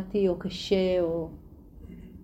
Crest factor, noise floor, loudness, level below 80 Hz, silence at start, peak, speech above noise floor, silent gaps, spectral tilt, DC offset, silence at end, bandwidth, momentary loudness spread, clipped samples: 18 dB; -47 dBFS; -27 LUFS; -50 dBFS; 0 s; -12 dBFS; 20 dB; none; -6.5 dB/octave; under 0.1%; 0 s; 15 kHz; 22 LU; under 0.1%